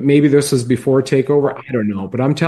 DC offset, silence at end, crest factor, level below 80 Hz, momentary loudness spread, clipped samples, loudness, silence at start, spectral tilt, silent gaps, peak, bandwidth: under 0.1%; 0 s; 14 dB; -54 dBFS; 8 LU; under 0.1%; -15 LUFS; 0 s; -6.5 dB/octave; none; 0 dBFS; 12.5 kHz